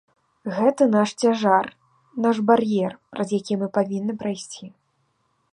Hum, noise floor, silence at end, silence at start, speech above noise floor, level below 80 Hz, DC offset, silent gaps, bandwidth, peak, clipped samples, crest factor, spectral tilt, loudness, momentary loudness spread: none; -69 dBFS; 0.85 s; 0.45 s; 48 dB; -68 dBFS; under 0.1%; none; 10.5 kHz; -4 dBFS; under 0.1%; 20 dB; -6 dB/octave; -22 LUFS; 15 LU